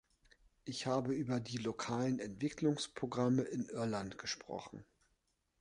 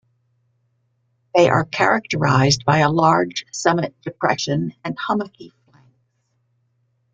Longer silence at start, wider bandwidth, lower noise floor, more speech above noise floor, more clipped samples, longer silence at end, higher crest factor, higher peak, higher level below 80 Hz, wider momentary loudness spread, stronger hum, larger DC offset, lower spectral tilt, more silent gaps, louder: second, 0.65 s vs 1.35 s; first, 11 kHz vs 9 kHz; first, -81 dBFS vs -68 dBFS; second, 43 dB vs 49 dB; neither; second, 0.8 s vs 1.65 s; about the same, 18 dB vs 20 dB; second, -22 dBFS vs 0 dBFS; second, -70 dBFS vs -56 dBFS; first, 12 LU vs 9 LU; neither; neither; about the same, -5.5 dB/octave vs -5 dB/octave; neither; second, -39 LUFS vs -19 LUFS